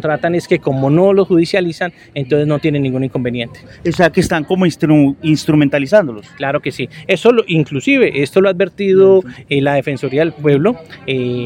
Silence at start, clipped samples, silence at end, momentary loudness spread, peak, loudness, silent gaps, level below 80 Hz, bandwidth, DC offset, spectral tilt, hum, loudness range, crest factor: 0 s; under 0.1%; 0 s; 10 LU; 0 dBFS; -14 LUFS; none; -48 dBFS; 16.5 kHz; under 0.1%; -7 dB/octave; none; 3 LU; 14 dB